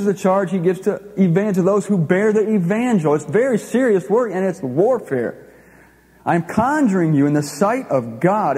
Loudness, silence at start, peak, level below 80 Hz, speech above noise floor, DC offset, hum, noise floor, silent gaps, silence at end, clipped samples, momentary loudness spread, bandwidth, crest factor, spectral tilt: -18 LUFS; 0 s; -2 dBFS; -58 dBFS; 32 dB; under 0.1%; none; -49 dBFS; none; 0 s; under 0.1%; 5 LU; 15 kHz; 16 dB; -7.5 dB/octave